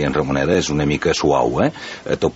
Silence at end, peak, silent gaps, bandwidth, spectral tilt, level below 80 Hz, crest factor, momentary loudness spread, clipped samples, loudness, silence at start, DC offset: 0 s; -2 dBFS; none; 8.2 kHz; -5.5 dB/octave; -38 dBFS; 16 dB; 5 LU; under 0.1%; -18 LUFS; 0 s; under 0.1%